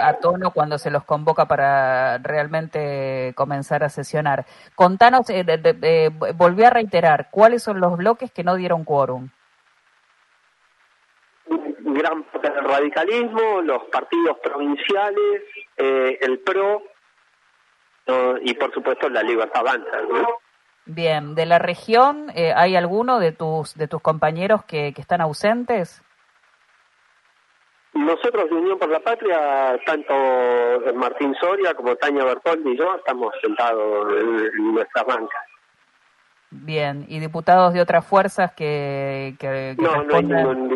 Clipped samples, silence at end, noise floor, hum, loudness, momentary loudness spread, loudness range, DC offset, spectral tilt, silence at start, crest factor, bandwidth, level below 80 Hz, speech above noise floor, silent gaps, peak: under 0.1%; 0 s; -61 dBFS; none; -19 LUFS; 9 LU; 8 LU; under 0.1%; -6.5 dB/octave; 0 s; 20 dB; 11.5 kHz; -64 dBFS; 41 dB; none; 0 dBFS